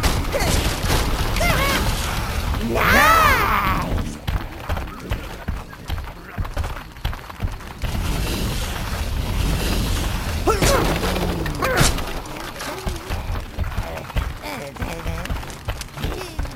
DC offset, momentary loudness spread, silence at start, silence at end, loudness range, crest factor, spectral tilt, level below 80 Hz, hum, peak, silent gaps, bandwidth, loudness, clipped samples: under 0.1%; 13 LU; 0 s; 0 s; 11 LU; 20 dB; -4 dB/octave; -26 dBFS; none; -2 dBFS; none; 16.5 kHz; -22 LUFS; under 0.1%